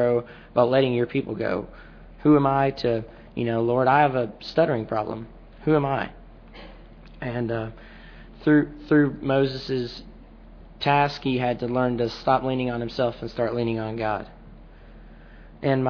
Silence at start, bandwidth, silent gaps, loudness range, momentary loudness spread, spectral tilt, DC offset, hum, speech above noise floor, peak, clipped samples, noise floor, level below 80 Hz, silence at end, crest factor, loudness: 0 s; 5.4 kHz; none; 6 LU; 14 LU; -8 dB/octave; under 0.1%; none; 23 dB; -6 dBFS; under 0.1%; -45 dBFS; -48 dBFS; 0 s; 20 dB; -24 LUFS